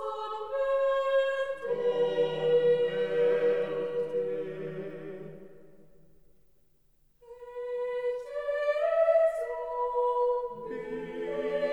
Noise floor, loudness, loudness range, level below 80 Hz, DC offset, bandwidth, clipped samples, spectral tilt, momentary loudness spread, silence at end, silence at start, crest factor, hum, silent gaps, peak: -67 dBFS; -29 LUFS; 13 LU; -64 dBFS; 0.2%; 8.6 kHz; under 0.1%; -6 dB/octave; 13 LU; 0 s; 0 s; 14 dB; none; none; -16 dBFS